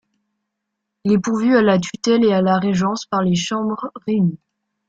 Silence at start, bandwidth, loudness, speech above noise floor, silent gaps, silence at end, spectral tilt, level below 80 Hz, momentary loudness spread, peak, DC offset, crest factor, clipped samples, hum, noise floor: 1.05 s; 8 kHz; -18 LUFS; 61 dB; none; 0.5 s; -6 dB/octave; -58 dBFS; 8 LU; -2 dBFS; under 0.1%; 16 dB; under 0.1%; none; -78 dBFS